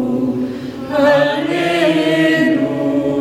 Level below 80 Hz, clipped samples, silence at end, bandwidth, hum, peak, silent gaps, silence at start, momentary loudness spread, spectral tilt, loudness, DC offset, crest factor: -50 dBFS; under 0.1%; 0 s; 15.5 kHz; none; -2 dBFS; none; 0 s; 8 LU; -6 dB/octave; -15 LUFS; under 0.1%; 12 dB